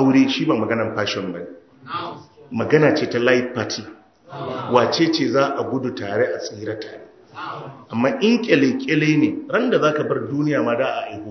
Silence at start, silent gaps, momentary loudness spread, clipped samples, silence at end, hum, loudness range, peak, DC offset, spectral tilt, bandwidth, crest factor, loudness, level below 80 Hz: 0 s; none; 16 LU; under 0.1%; 0 s; none; 3 LU; 0 dBFS; under 0.1%; -6 dB/octave; 6.4 kHz; 20 dB; -20 LUFS; -62 dBFS